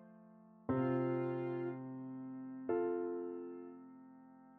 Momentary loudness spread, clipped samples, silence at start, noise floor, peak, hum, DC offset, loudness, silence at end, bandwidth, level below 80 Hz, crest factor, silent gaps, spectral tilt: 22 LU; under 0.1%; 0 s; -61 dBFS; -26 dBFS; none; under 0.1%; -40 LUFS; 0 s; 4.1 kHz; -76 dBFS; 16 dB; none; -11 dB/octave